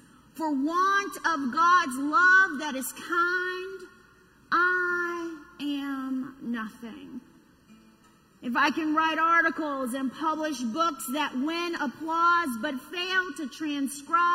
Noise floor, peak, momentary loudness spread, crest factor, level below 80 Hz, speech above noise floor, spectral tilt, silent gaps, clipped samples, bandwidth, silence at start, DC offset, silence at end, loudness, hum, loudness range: -59 dBFS; -10 dBFS; 14 LU; 18 dB; -68 dBFS; 33 dB; -2.5 dB/octave; none; under 0.1%; 16 kHz; 0.35 s; under 0.1%; 0 s; -26 LUFS; none; 9 LU